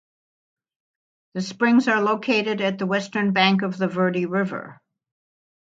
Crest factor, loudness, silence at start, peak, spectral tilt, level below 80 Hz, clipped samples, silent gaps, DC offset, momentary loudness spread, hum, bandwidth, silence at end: 22 dB; -21 LUFS; 1.35 s; -2 dBFS; -6 dB/octave; -72 dBFS; under 0.1%; none; under 0.1%; 11 LU; none; 7.8 kHz; 0.85 s